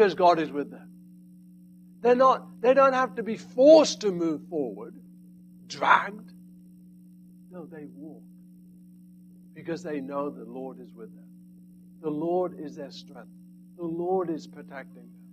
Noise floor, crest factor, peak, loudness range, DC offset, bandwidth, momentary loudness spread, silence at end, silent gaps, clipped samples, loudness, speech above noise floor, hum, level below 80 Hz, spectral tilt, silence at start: -51 dBFS; 22 dB; -4 dBFS; 17 LU; under 0.1%; 14.5 kHz; 25 LU; 0.3 s; none; under 0.1%; -24 LUFS; 25 dB; 60 Hz at -45 dBFS; -74 dBFS; -5 dB/octave; 0 s